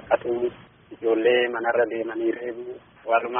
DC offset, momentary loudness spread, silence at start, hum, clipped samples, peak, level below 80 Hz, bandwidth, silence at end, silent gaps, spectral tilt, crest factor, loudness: under 0.1%; 14 LU; 0 s; none; under 0.1%; -6 dBFS; -64 dBFS; 3.6 kHz; 0 s; none; 0.5 dB/octave; 18 dB; -24 LUFS